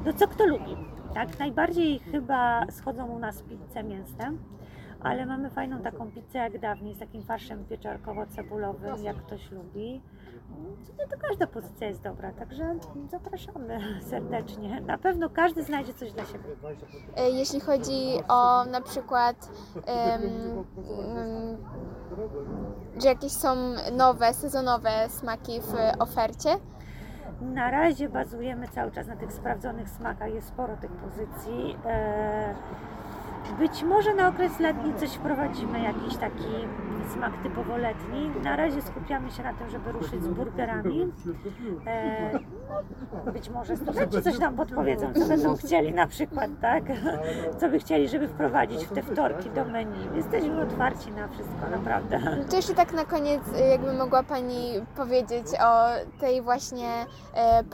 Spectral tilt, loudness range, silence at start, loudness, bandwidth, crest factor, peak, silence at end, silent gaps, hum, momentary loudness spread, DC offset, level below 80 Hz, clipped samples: -5.5 dB/octave; 10 LU; 0 s; -28 LUFS; 17 kHz; 20 dB; -8 dBFS; 0 s; none; none; 15 LU; under 0.1%; -46 dBFS; under 0.1%